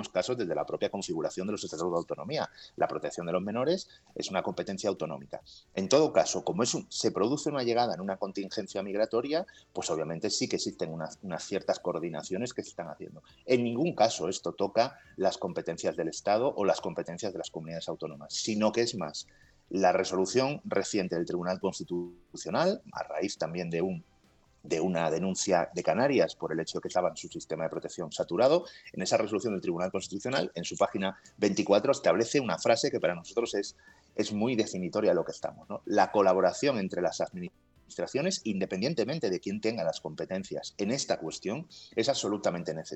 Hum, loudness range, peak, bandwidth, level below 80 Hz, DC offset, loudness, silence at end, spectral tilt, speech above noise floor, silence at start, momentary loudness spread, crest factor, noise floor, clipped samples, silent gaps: none; 4 LU; -10 dBFS; 8.8 kHz; -70 dBFS; under 0.1%; -31 LUFS; 0 s; -4.5 dB/octave; 34 dB; 0 s; 12 LU; 20 dB; -65 dBFS; under 0.1%; none